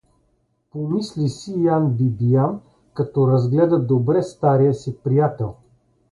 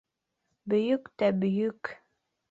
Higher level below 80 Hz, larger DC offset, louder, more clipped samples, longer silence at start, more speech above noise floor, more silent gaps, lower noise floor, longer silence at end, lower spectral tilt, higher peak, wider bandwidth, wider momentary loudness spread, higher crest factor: first, -54 dBFS vs -72 dBFS; neither; first, -20 LUFS vs -28 LUFS; neither; about the same, 0.75 s vs 0.65 s; second, 47 dB vs 53 dB; neither; second, -66 dBFS vs -80 dBFS; about the same, 0.6 s vs 0.55 s; about the same, -9 dB/octave vs -8.5 dB/octave; first, -4 dBFS vs -14 dBFS; first, 11 kHz vs 7.6 kHz; about the same, 12 LU vs 14 LU; about the same, 16 dB vs 18 dB